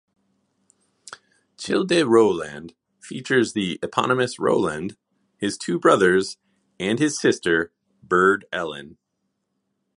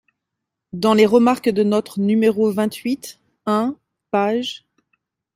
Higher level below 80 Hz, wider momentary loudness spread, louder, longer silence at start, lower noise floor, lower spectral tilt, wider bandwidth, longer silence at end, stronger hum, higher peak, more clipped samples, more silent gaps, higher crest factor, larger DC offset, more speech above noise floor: about the same, -60 dBFS vs -64 dBFS; about the same, 17 LU vs 16 LU; about the same, -21 LUFS vs -19 LUFS; first, 1.1 s vs 0.75 s; second, -76 dBFS vs -81 dBFS; second, -4.5 dB/octave vs -6 dB/octave; second, 11.5 kHz vs 16 kHz; first, 1.1 s vs 0.8 s; neither; about the same, -2 dBFS vs -2 dBFS; neither; neither; about the same, 20 dB vs 18 dB; neither; second, 55 dB vs 64 dB